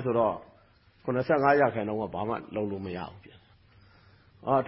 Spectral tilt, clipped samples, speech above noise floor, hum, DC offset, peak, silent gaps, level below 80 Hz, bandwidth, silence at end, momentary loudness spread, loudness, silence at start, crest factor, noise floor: -11 dB/octave; under 0.1%; 33 dB; none; under 0.1%; -10 dBFS; none; -60 dBFS; 5.8 kHz; 0 s; 16 LU; -29 LUFS; 0 s; 20 dB; -61 dBFS